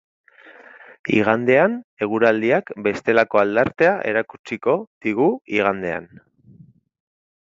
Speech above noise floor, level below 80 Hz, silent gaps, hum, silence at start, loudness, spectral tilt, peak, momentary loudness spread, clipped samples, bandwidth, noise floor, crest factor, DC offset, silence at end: 31 dB; -60 dBFS; 1.84-1.97 s, 4.39-4.44 s, 4.87-5.01 s; none; 1.05 s; -19 LUFS; -7 dB/octave; 0 dBFS; 9 LU; under 0.1%; 7.6 kHz; -50 dBFS; 20 dB; under 0.1%; 1.45 s